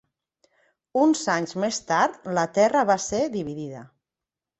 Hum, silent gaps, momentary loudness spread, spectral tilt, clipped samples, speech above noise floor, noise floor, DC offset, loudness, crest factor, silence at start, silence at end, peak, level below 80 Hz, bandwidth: none; none; 12 LU; -4.5 dB/octave; under 0.1%; 66 dB; -89 dBFS; under 0.1%; -23 LUFS; 18 dB; 0.95 s; 0.75 s; -6 dBFS; -62 dBFS; 8.4 kHz